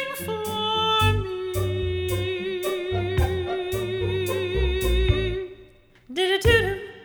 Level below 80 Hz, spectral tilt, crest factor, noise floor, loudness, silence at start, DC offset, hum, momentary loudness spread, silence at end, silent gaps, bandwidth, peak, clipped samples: -32 dBFS; -5 dB/octave; 18 dB; -51 dBFS; -24 LUFS; 0 s; under 0.1%; none; 9 LU; 0 s; none; over 20 kHz; -6 dBFS; under 0.1%